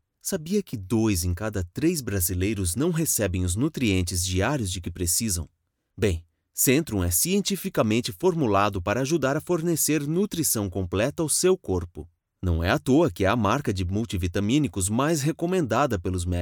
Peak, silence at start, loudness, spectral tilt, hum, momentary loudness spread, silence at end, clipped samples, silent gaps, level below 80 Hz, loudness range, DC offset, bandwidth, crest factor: -8 dBFS; 0.25 s; -25 LUFS; -4.5 dB/octave; none; 7 LU; 0 s; under 0.1%; none; -44 dBFS; 2 LU; under 0.1%; over 20 kHz; 18 dB